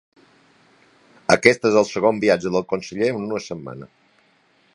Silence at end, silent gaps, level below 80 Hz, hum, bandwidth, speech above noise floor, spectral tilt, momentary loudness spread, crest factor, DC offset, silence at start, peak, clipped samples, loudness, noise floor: 0.9 s; none; -58 dBFS; none; 11.5 kHz; 40 dB; -4.5 dB/octave; 17 LU; 22 dB; under 0.1%; 1.3 s; 0 dBFS; under 0.1%; -19 LUFS; -60 dBFS